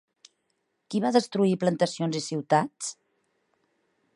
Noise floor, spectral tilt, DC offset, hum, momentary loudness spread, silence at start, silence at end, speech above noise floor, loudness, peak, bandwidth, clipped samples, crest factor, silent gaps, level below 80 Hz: -76 dBFS; -5.5 dB/octave; under 0.1%; none; 9 LU; 0.9 s; 1.25 s; 51 dB; -26 LUFS; -8 dBFS; 11 kHz; under 0.1%; 22 dB; none; -78 dBFS